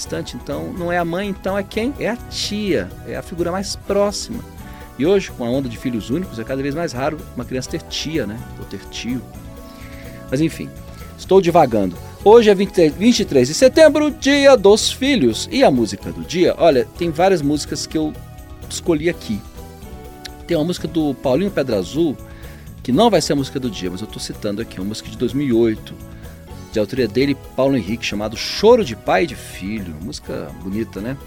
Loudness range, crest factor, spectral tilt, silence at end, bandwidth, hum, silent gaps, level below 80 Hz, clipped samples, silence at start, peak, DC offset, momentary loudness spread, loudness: 10 LU; 18 dB; -5 dB/octave; 0 s; 18 kHz; none; none; -40 dBFS; under 0.1%; 0 s; 0 dBFS; under 0.1%; 21 LU; -18 LUFS